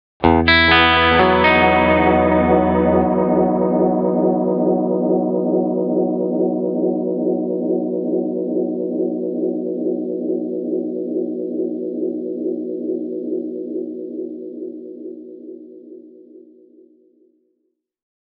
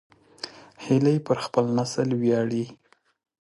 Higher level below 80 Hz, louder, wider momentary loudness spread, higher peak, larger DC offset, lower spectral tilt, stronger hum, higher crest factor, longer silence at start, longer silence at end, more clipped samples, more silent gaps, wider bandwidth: first, -40 dBFS vs -66 dBFS; first, -18 LUFS vs -24 LUFS; about the same, 16 LU vs 17 LU; first, 0 dBFS vs -8 dBFS; neither; second, -4 dB/octave vs -6.5 dB/octave; neither; about the same, 18 dB vs 18 dB; second, 0.2 s vs 0.45 s; first, 1.85 s vs 0.7 s; neither; neither; second, 5.4 kHz vs 11.5 kHz